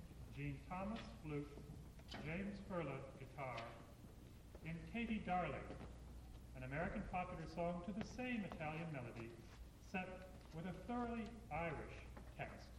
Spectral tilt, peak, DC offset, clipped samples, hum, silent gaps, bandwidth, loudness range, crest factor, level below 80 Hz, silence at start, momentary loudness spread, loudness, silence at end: -6.5 dB/octave; -32 dBFS; under 0.1%; under 0.1%; none; none; 16.5 kHz; 3 LU; 16 dB; -60 dBFS; 0 s; 13 LU; -49 LUFS; 0 s